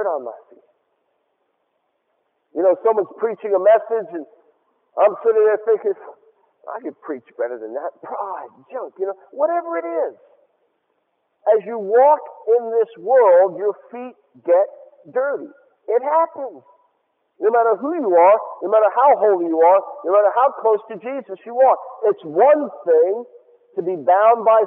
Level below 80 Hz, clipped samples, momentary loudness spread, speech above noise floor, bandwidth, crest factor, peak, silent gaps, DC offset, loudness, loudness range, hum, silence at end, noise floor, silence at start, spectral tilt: -84 dBFS; under 0.1%; 17 LU; 53 dB; 3.6 kHz; 16 dB; -2 dBFS; none; under 0.1%; -18 LUFS; 10 LU; none; 0 s; -70 dBFS; 0 s; -9 dB/octave